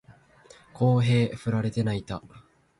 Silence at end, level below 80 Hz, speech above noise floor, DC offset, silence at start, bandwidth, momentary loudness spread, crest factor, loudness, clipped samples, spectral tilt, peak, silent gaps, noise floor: 0.4 s; -54 dBFS; 30 dB; under 0.1%; 0.1 s; 11 kHz; 13 LU; 16 dB; -25 LUFS; under 0.1%; -7.5 dB/octave; -12 dBFS; none; -54 dBFS